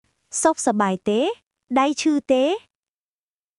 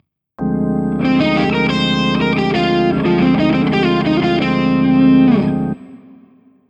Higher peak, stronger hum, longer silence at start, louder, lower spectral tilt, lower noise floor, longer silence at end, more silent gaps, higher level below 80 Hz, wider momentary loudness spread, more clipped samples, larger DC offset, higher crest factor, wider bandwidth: about the same, -4 dBFS vs -2 dBFS; neither; about the same, 0.3 s vs 0.4 s; second, -21 LUFS vs -14 LUFS; second, -4 dB/octave vs -7.5 dB/octave; first, under -90 dBFS vs -48 dBFS; first, 1 s vs 0.75 s; first, 1.47-1.51 s vs none; second, -64 dBFS vs -38 dBFS; about the same, 8 LU vs 7 LU; neither; neither; about the same, 18 dB vs 14 dB; first, 11.5 kHz vs 7.8 kHz